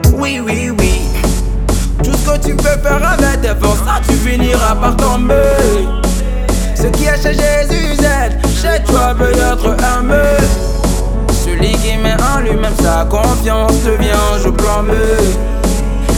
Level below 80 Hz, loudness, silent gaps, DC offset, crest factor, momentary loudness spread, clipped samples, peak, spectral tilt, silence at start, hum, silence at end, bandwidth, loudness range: -14 dBFS; -13 LUFS; none; under 0.1%; 10 dB; 4 LU; under 0.1%; 0 dBFS; -5 dB/octave; 0 s; none; 0 s; 17 kHz; 1 LU